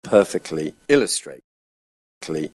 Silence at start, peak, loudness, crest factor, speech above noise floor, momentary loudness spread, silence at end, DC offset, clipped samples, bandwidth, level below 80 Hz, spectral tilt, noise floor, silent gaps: 0.05 s; -2 dBFS; -21 LUFS; 22 dB; over 69 dB; 16 LU; 0.1 s; under 0.1%; under 0.1%; 12.5 kHz; -58 dBFS; -4 dB/octave; under -90 dBFS; 1.44-2.21 s